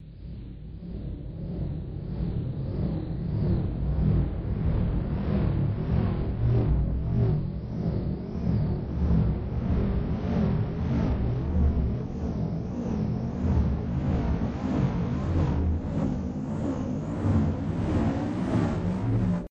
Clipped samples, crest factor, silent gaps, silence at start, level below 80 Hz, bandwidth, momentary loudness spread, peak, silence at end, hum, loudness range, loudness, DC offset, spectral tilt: under 0.1%; 14 dB; none; 0 s; -32 dBFS; 7.6 kHz; 7 LU; -12 dBFS; 0.05 s; none; 2 LU; -28 LUFS; under 0.1%; -9.5 dB/octave